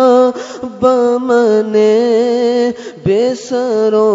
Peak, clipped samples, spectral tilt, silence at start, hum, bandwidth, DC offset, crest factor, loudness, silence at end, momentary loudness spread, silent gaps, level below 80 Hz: 0 dBFS; under 0.1%; -6 dB/octave; 0 s; none; 7.8 kHz; under 0.1%; 12 dB; -12 LUFS; 0 s; 7 LU; none; -54 dBFS